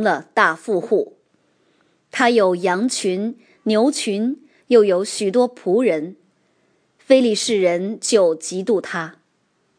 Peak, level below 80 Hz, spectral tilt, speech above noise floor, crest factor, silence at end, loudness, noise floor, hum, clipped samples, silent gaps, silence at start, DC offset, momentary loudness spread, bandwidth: 0 dBFS; -74 dBFS; -4 dB/octave; 48 dB; 18 dB; 0.65 s; -18 LUFS; -65 dBFS; none; under 0.1%; none; 0 s; under 0.1%; 12 LU; 10.5 kHz